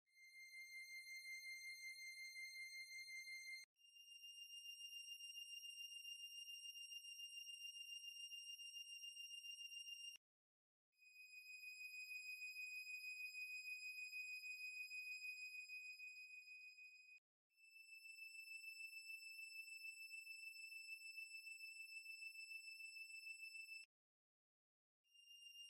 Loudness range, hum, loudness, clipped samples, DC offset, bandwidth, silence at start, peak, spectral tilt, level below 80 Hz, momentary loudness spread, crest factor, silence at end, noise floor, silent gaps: 5 LU; none; -53 LUFS; under 0.1%; under 0.1%; 16 kHz; 0.1 s; -44 dBFS; 7 dB/octave; under -90 dBFS; 9 LU; 12 dB; 0 s; under -90 dBFS; 3.64-3.76 s, 10.17-10.92 s, 17.18-17.50 s, 23.85-25.04 s